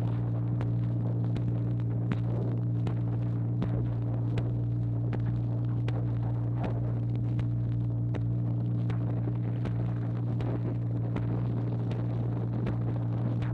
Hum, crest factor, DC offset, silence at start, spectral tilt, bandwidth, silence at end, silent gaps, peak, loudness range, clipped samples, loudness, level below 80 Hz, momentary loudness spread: none; 14 dB; under 0.1%; 0 s; -10.5 dB/octave; 4.1 kHz; 0 s; none; -14 dBFS; 1 LU; under 0.1%; -31 LUFS; -46 dBFS; 1 LU